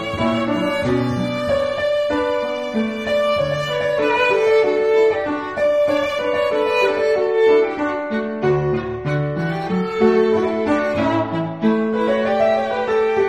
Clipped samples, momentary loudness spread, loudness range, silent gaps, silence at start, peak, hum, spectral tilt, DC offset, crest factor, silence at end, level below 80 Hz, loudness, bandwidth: under 0.1%; 6 LU; 3 LU; none; 0 s; -4 dBFS; none; -6.5 dB/octave; 0.2%; 14 dB; 0 s; -48 dBFS; -18 LUFS; 12.5 kHz